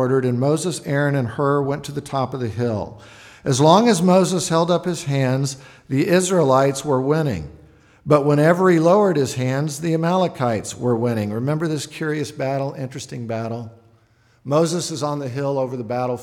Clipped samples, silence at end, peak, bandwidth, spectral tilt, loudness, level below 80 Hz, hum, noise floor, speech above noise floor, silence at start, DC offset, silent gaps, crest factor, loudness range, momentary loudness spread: under 0.1%; 0 s; -2 dBFS; 16 kHz; -6 dB/octave; -20 LUFS; -54 dBFS; none; -57 dBFS; 38 dB; 0 s; under 0.1%; none; 18 dB; 7 LU; 13 LU